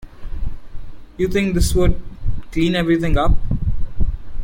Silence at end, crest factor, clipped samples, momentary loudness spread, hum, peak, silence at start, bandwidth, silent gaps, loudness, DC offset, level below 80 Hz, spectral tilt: 0 s; 14 dB; under 0.1%; 15 LU; none; -4 dBFS; 0.05 s; 16.5 kHz; none; -20 LUFS; under 0.1%; -22 dBFS; -6 dB/octave